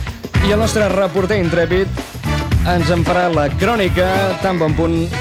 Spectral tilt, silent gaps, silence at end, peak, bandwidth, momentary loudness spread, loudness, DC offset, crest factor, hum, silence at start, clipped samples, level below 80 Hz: -6 dB/octave; none; 0 s; -2 dBFS; 16.5 kHz; 4 LU; -16 LUFS; under 0.1%; 14 dB; none; 0 s; under 0.1%; -26 dBFS